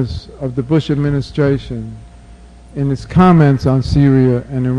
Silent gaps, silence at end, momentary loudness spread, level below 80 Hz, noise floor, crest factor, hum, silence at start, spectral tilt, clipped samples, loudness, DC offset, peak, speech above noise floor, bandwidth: none; 0 s; 15 LU; -32 dBFS; -38 dBFS; 14 dB; none; 0 s; -8.5 dB/octave; under 0.1%; -14 LUFS; under 0.1%; 0 dBFS; 25 dB; 9.6 kHz